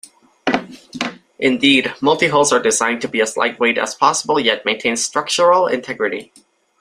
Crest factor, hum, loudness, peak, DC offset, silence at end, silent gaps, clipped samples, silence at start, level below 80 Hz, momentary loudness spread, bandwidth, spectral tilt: 18 dB; none; -16 LUFS; 0 dBFS; under 0.1%; 0.55 s; none; under 0.1%; 0.45 s; -60 dBFS; 11 LU; 15.5 kHz; -2.5 dB/octave